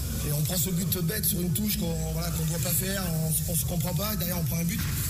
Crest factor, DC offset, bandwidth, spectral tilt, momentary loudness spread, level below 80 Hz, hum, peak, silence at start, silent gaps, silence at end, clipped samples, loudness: 12 dB; under 0.1%; 16 kHz; -4.5 dB/octave; 3 LU; -38 dBFS; none; -14 dBFS; 0 s; none; 0 s; under 0.1%; -27 LUFS